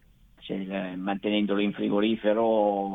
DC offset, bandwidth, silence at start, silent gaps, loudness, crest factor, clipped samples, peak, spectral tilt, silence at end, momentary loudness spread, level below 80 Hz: under 0.1%; 4 kHz; 0.4 s; none; -27 LUFS; 16 dB; under 0.1%; -12 dBFS; -8.5 dB/octave; 0 s; 11 LU; -62 dBFS